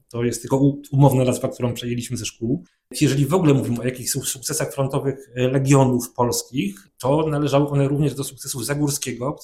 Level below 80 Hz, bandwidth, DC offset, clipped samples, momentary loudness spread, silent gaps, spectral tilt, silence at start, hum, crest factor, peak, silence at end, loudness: -50 dBFS; 16 kHz; under 0.1%; under 0.1%; 10 LU; none; -5.5 dB/octave; 0.15 s; none; 20 dB; 0 dBFS; 0 s; -21 LUFS